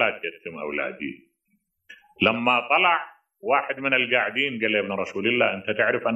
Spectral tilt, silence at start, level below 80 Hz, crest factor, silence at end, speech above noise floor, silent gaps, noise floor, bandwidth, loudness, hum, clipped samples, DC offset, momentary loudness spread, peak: -5.5 dB/octave; 0 s; -68 dBFS; 20 dB; 0 s; 48 dB; none; -72 dBFS; 8 kHz; -23 LUFS; none; under 0.1%; under 0.1%; 14 LU; -4 dBFS